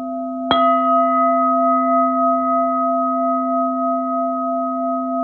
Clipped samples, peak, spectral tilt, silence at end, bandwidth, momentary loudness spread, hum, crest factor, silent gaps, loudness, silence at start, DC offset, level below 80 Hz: under 0.1%; 0 dBFS; -7.5 dB/octave; 0 s; 4.3 kHz; 6 LU; none; 16 dB; none; -17 LUFS; 0 s; under 0.1%; -60 dBFS